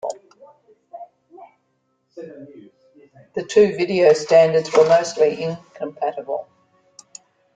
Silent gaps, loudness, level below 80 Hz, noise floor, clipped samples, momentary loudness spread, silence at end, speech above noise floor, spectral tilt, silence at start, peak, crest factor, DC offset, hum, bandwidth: none; -18 LUFS; -64 dBFS; -69 dBFS; under 0.1%; 25 LU; 1.15 s; 51 dB; -5 dB/octave; 0.05 s; -2 dBFS; 18 dB; under 0.1%; none; 9.2 kHz